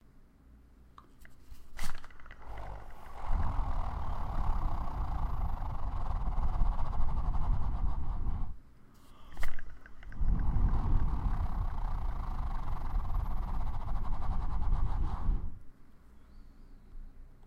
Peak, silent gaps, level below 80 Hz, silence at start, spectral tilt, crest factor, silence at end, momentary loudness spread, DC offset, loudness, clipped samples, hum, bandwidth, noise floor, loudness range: -14 dBFS; none; -34 dBFS; 1.2 s; -7.5 dB/octave; 16 dB; 0 s; 21 LU; under 0.1%; -38 LUFS; under 0.1%; none; 4.9 kHz; -58 dBFS; 5 LU